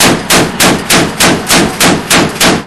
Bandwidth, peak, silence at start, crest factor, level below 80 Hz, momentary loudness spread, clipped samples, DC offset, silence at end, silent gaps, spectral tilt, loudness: 16 kHz; 0 dBFS; 0 s; 8 dB; -32 dBFS; 3 LU; 2%; under 0.1%; 0 s; none; -2.5 dB/octave; -7 LUFS